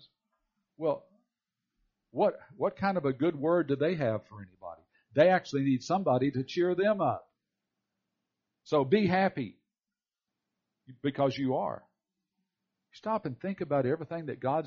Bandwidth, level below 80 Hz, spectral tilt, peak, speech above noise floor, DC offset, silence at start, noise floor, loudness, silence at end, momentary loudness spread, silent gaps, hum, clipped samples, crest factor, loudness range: 7 kHz; -72 dBFS; -5.5 dB/octave; -10 dBFS; over 61 dB; under 0.1%; 0.8 s; under -90 dBFS; -30 LUFS; 0 s; 14 LU; none; none; under 0.1%; 20 dB; 6 LU